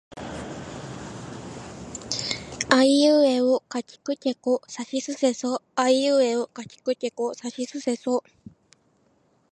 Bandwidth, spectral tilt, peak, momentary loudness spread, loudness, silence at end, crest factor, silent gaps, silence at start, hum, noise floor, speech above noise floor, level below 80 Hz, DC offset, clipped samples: 11.5 kHz; -3.5 dB/octave; -2 dBFS; 19 LU; -24 LUFS; 1.3 s; 22 dB; none; 0.1 s; none; -64 dBFS; 41 dB; -58 dBFS; under 0.1%; under 0.1%